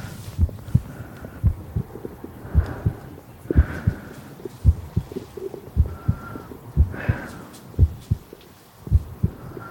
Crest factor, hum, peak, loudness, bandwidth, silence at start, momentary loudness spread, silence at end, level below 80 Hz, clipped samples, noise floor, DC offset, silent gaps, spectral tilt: 22 dB; none; -2 dBFS; -25 LUFS; 17 kHz; 0 s; 16 LU; 0 s; -30 dBFS; under 0.1%; -47 dBFS; under 0.1%; none; -8.5 dB/octave